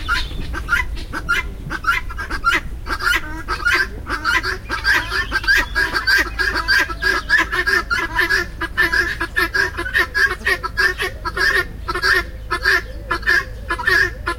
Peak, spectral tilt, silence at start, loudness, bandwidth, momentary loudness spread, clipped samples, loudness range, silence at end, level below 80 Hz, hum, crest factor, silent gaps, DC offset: -4 dBFS; -3 dB/octave; 0 s; -18 LUFS; 16.5 kHz; 8 LU; under 0.1%; 4 LU; 0 s; -30 dBFS; none; 16 dB; none; under 0.1%